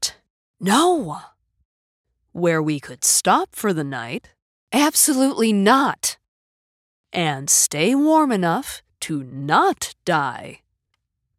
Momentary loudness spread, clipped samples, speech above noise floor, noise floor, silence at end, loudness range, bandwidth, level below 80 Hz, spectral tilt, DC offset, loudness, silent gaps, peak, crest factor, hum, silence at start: 15 LU; under 0.1%; 56 dB; -75 dBFS; 0.85 s; 3 LU; 17 kHz; -62 dBFS; -3 dB/octave; under 0.1%; -19 LUFS; 0.30-0.54 s, 1.65-2.04 s, 4.42-4.67 s, 6.28-7.04 s; -4 dBFS; 18 dB; none; 0 s